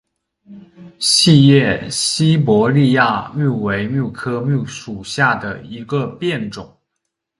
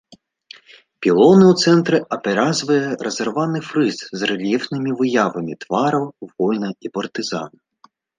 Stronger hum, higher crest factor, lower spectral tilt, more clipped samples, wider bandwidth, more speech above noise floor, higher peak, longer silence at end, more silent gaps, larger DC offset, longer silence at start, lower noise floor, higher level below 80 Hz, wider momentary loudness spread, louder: neither; about the same, 16 dB vs 16 dB; about the same, -5 dB/octave vs -5.5 dB/octave; neither; first, 11.5 kHz vs 9.6 kHz; first, 60 dB vs 37 dB; about the same, 0 dBFS vs -2 dBFS; about the same, 0.75 s vs 0.7 s; neither; neither; second, 0.5 s vs 1 s; first, -76 dBFS vs -55 dBFS; first, -50 dBFS vs -64 dBFS; about the same, 16 LU vs 14 LU; first, -15 LUFS vs -18 LUFS